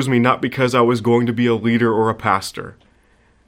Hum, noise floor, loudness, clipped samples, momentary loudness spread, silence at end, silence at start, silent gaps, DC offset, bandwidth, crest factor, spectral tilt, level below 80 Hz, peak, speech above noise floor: none; -55 dBFS; -17 LUFS; under 0.1%; 9 LU; 0.75 s; 0 s; none; under 0.1%; 15.5 kHz; 18 dB; -6.5 dB/octave; -54 dBFS; 0 dBFS; 38 dB